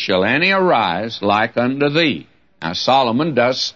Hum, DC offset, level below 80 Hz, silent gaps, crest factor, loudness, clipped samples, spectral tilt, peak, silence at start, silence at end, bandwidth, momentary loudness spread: none; 0.2%; -58 dBFS; none; 14 dB; -16 LUFS; under 0.1%; -5 dB/octave; -2 dBFS; 0 s; 0.05 s; 7.4 kHz; 7 LU